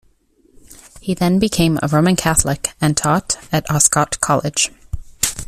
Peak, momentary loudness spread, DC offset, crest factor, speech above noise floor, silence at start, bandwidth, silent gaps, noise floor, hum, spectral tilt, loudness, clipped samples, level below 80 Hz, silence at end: 0 dBFS; 7 LU; under 0.1%; 18 dB; 39 dB; 0.7 s; 15.5 kHz; none; -56 dBFS; none; -4 dB/octave; -16 LUFS; under 0.1%; -36 dBFS; 0.05 s